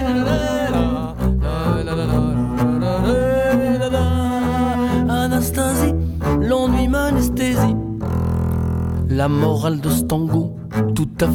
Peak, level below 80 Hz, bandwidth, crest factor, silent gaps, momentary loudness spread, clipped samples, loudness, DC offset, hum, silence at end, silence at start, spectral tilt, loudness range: -4 dBFS; -28 dBFS; 17.5 kHz; 14 dB; none; 4 LU; under 0.1%; -19 LUFS; under 0.1%; none; 0 s; 0 s; -6.5 dB/octave; 1 LU